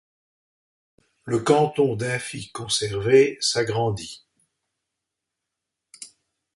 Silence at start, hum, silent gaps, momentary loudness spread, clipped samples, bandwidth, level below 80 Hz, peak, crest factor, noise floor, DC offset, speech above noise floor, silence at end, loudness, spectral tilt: 1.25 s; none; none; 24 LU; under 0.1%; 11.5 kHz; -58 dBFS; -4 dBFS; 22 dB; -84 dBFS; under 0.1%; 62 dB; 0.5 s; -22 LUFS; -4.5 dB/octave